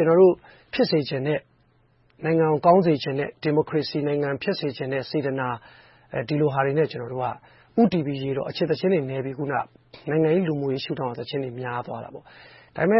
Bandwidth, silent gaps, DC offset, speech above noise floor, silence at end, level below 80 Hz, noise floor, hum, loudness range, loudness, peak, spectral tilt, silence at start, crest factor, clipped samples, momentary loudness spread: 5.8 kHz; none; under 0.1%; 38 dB; 0 s; -62 dBFS; -61 dBFS; none; 4 LU; -24 LUFS; -6 dBFS; -10.5 dB/octave; 0 s; 18 dB; under 0.1%; 13 LU